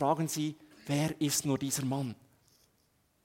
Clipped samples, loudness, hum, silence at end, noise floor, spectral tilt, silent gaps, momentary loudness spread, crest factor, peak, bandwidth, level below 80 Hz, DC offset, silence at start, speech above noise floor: under 0.1%; -33 LUFS; none; 1.1 s; -72 dBFS; -4.5 dB/octave; none; 11 LU; 18 dB; -16 dBFS; 16.5 kHz; -70 dBFS; under 0.1%; 0 s; 40 dB